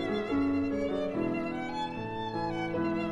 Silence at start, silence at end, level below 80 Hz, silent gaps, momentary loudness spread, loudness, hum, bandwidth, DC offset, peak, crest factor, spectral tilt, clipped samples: 0 s; 0 s; -54 dBFS; none; 6 LU; -32 LUFS; none; 9.2 kHz; under 0.1%; -20 dBFS; 12 dB; -7 dB/octave; under 0.1%